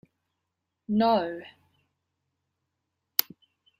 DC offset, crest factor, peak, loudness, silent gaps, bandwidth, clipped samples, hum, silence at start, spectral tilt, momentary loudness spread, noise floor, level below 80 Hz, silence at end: under 0.1%; 32 dB; 0 dBFS; -27 LUFS; none; 16 kHz; under 0.1%; none; 0.9 s; -4.5 dB/octave; 17 LU; -83 dBFS; -74 dBFS; 0.55 s